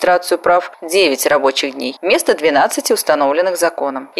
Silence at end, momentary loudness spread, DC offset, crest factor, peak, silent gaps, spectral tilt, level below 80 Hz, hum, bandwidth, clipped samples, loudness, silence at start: 0 s; 5 LU; under 0.1%; 14 dB; 0 dBFS; none; -1.5 dB/octave; -60 dBFS; none; 15.5 kHz; under 0.1%; -15 LUFS; 0 s